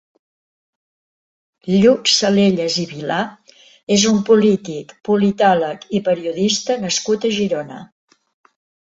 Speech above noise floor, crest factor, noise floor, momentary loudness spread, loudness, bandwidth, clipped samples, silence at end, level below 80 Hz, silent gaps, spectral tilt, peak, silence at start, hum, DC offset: over 74 dB; 16 dB; under -90 dBFS; 14 LU; -16 LUFS; 8.2 kHz; under 0.1%; 1.15 s; -56 dBFS; 3.83-3.87 s; -4 dB/octave; -2 dBFS; 1.65 s; none; under 0.1%